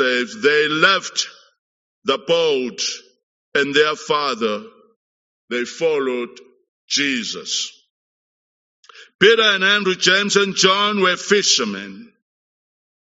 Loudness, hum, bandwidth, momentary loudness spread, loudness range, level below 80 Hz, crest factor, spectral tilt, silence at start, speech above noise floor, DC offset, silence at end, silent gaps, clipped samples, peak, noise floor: -17 LUFS; none; 8 kHz; 13 LU; 8 LU; -70 dBFS; 20 dB; -0.5 dB/octave; 0 s; over 72 dB; under 0.1%; 1 s; 1.59-2.02 s, 3.23-3.52 s, 4.96-5.48 s, 6.68-6.88 s, 7.90-8.83 s, 9.15-9.19 s; under 0.1%; 0 dBFS; under -90 dBFS